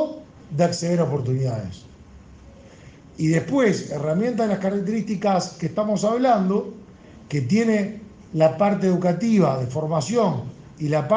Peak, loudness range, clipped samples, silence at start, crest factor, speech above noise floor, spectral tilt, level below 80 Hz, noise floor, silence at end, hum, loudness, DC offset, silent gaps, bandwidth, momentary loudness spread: -6 dBFS; 4 LU; under 0.1%; 0 s; 16 dB; 25 dB; -7 dB/octave; -56 dBFS; -45 dBFS; 0 s; none; -22 LUFS; under 0.1%; none; 9.8 kHz; 12 LU